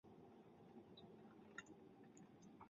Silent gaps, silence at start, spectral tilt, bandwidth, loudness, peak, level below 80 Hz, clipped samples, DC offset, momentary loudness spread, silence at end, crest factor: none; 0.05 s; -4.5 dB/octave; 7.2 kHz; -63 LUFS; -38 dBFS; -88 dBFS; under 0.1%; under 0.1%; 6 LU; 0 s; 26 dB